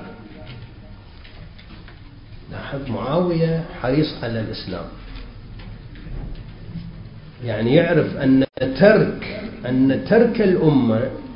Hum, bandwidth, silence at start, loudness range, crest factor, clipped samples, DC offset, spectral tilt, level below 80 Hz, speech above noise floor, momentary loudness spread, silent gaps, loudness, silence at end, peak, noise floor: none; 5.4 kHz; 0 s; 13 LU; 20 dB; under 0.1%; under 0.1%; -12 dB/octave; -40 dBFS; 22 dB; 23 LU; none; -19 LUFS; 0 s; 0 dBFS; -40 dBFS